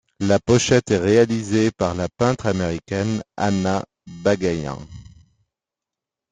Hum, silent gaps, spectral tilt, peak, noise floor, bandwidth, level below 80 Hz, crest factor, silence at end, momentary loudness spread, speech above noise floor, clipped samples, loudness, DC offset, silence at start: none; none; -5.5 dB/octave; -2 dBFS; -87 dBFS; 9.6 kHz; -50 dBFS; 18 dB; 1.3 s; 10 LU; 67 dB; under 0.1%; -20 LUFS; under 0.1%; 0.2 s